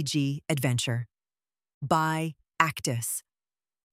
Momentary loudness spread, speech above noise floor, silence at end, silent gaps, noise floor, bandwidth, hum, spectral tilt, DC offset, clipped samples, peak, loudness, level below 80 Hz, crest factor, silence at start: 10 LU; over 62 dB; 0.75 s; 1.74-1.81 s; under -90 dBFS; 16 kHz; none; -4.5 dB/octave; under 0.1%; under 0.1%; -4 dBFS; -28 LUFS; -66 dBFS; 26 dB; 0 s